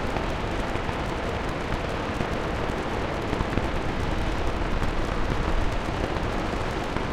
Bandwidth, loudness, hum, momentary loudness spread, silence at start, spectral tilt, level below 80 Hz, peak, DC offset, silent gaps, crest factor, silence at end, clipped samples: 13.5 kHz; -28 LUFS; none; 2 LU; 0 s; -6 dB/octave; -32 dBFS; -6 dBFS; under 0.1%; none; 20 dB; 0 s; under 0.1%